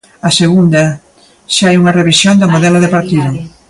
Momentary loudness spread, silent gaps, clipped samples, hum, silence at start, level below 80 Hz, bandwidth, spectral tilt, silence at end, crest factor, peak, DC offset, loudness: 7 LU; none; under 0.1%; none; 0.25 s; -46 dBFS; 11.5 kHz; -5 dB/octave; 0.2 s; 10 dB; 0 dBFS; under 0.1%; -9 LUFS